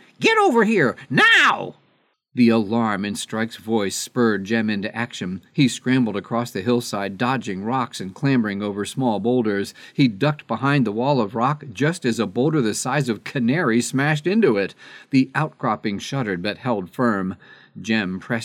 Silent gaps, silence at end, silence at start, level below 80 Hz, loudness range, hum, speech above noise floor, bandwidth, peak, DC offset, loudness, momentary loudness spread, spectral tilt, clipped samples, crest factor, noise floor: none; 0 s; 0.2 s; -68 dBFS; 4 LU; none; 43 dB; 15.5 kHz; -4 dBFS; under 0.1%; -21 LUFS; 9 LU; -5 dB/octave; under 0.1%; 16 dB; -64 dBFS